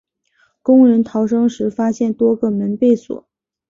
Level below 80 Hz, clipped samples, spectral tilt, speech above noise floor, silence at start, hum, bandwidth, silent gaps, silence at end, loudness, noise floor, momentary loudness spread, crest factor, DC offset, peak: -58 dBFS; under 0.1%; -8 dB/octave; 46 dB; 0.65 s; none; 7.4 kHz; none; 0.5 s; -15 LUFS; -60 dBFS; 10 LU; 14 dB; under 0.1%; -2 dBFS